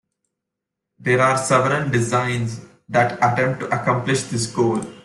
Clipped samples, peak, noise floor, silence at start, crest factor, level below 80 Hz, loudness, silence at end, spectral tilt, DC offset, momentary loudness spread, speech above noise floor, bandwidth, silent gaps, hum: under 0.1%; -4 dBFS; -82 dBFS; 1.05 s; 16 dB; -56 dBFS; -20 LUFS; 0.05 s; -5 dB/octave; under 0.1%; 7 LU; 63 dB; 12 kHz; none; none